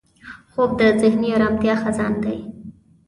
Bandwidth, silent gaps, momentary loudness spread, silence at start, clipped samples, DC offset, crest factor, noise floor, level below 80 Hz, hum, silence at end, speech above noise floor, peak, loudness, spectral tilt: 11 kHz; none; 14 LU; 0.25 s; under 0.1%; under 0.1%; 16 dB; -42 dBFS; -48 dBFS; none; 0.35 s; 24 dB; -4 dBFS; -19 LUFS; -6.5 dB/octave